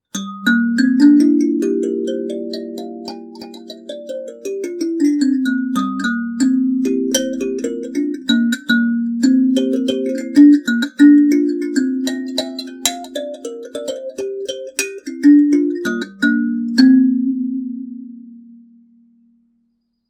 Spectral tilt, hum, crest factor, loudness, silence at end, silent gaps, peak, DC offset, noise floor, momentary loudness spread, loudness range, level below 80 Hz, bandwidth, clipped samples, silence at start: -4 dB/octave; none; 16 dB; -16 LUFS; 1.7 s; none; 0 dBFS; under 0.1%; -66 dBFS; 18 LU; 9 LU; -64 dBFS; 14.5 kHz; under 0.1%; 0.15 s